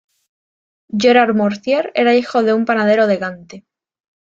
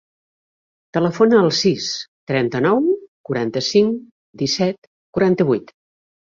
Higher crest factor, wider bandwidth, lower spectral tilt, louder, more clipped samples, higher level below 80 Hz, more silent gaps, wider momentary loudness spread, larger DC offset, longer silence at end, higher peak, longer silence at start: about the same, 16 dB vs 18 dB; about the same, 7.6 kHz vs 7.6 kHz; about the same, -5.5 dB/octave vs -5.5 dB/octave; first, -15 LUFS vs -19 LUFS; neither; about the same, -62 dBFS vs -58 dBFS; second, none vs 2.08-2.27 s, 3.08-3.24 s, 4.11-4.33 s, 4.78-5.13 s; about the same, 10 LU vs 12 LU; neither; about the same, 0.75 s vs 0.8 s; about the same, -2 dBFS vs -2 dBFS; about the same, 0.95 s vs 0.95 s